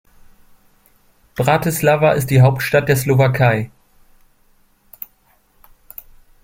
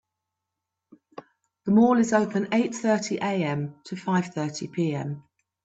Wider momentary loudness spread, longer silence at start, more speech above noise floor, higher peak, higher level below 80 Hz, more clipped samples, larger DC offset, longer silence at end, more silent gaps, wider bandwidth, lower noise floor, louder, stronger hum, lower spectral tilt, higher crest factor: first, 23 LU vs 15 LU; second, 1.4 s vs 1.65 s; second, 43 dB vs 61 dB; first, -2 dBFS vs -8 dBFS; first, -48 dBFS vs -68 dBFS; neither; neither; first, 2.75 s vs 0.45 s; neither; first, 16.5 kHz vs 8.2 kHz; second, -57 dBFS vs -85 dBFS; first, -15 LUFS vs -25 LUFS; neither; about the same, -6 dB/octave vs -6 dB/octave; about the same, 18 dB vs 18 dB